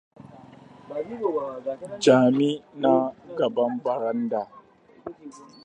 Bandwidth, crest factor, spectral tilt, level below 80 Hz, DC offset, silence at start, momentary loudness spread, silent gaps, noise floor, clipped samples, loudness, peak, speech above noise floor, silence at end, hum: 9.6 kHz; 20 dB; -6 dB/octave; -70 dBFS; under 0.1%; 0.2 s; 22 LU; none; -48 dBFS; under 0.1%; -24 LUFS; -4 dBFS; 24 dB; 0.2 s; none